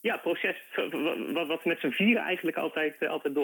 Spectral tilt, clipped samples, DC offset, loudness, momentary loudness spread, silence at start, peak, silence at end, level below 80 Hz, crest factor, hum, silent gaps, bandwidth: -5.5 dB/octave; under 0.1%; under 0.1%; -29 LUFS; 7 LU; 0.05 s; -12 dBFS; 0 s; -86 dBFS; 18 dB; none; none; 19 kHz